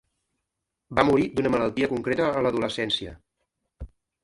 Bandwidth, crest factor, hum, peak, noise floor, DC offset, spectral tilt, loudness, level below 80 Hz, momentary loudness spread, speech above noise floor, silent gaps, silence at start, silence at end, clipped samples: 11.5 kHz; 24 dB; none; -4 dBFS; -83 dBFS; under 0.1%; -6 dB/octave; -24 LUFS; -50 dBFS; 7 LU; 59 dB; none; 0.9 s; 0.35 s; under 0.1%